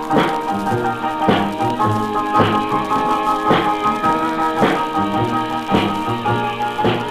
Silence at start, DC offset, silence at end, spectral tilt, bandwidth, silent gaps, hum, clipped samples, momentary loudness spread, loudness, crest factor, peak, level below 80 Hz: 0 s; 0.2%; 0 s; -6 dB/octave; 15.5 kHz; none; none; under 0.1%; 4 LU; -18 LUFS; 16 dB; 0 dBFS; -44 dBFS